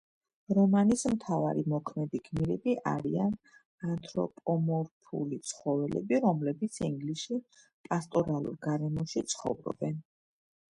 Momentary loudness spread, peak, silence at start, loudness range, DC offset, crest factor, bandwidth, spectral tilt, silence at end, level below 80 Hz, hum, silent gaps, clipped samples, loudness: 9 LU; -14 dBFS; 0.5 s; 4 LU; under 0.1%; 18 dB; 11.5 kHz; -6.5 dB/octave; 0.7 s; -62 dBFS; none; 3.65-3.78 s, 4.91-5.01 s, 7.73-7.84 s; under 0.1%; -32 LUFS